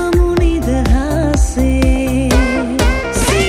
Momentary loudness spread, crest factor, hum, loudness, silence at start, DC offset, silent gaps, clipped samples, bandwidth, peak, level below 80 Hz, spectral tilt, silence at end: 2 LU; 12 dB; none; -14 LUFS; 0 s; under 0.1%; none; under 0.1%; 15 kHz; 0 dBFS; -16 dBFS; -5.5 dB/octave; 0 s